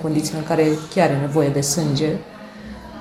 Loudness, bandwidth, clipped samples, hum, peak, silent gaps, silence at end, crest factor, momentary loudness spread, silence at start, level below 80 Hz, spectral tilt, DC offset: -20 LUFS; 16 kHz; under 0.1%; none; -4 dBFS; none; 0 s; 16 dB; 18 LU; 0 s; -48 dBFS; -5 dB/octave; under 0.1%